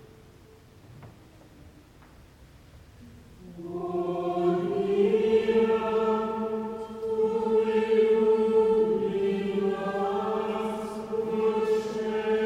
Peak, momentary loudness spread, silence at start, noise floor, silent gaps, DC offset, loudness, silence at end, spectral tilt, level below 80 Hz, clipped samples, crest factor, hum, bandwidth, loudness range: -12 dBFS; 10 LU; 0 s; -53 dBFS; none; under 0.1%; -26 LUFS; 0 s; -7 dB/octave; -58 dBFS; under 0.1%; 14 dB; none; 10.5 kHz; 8 LU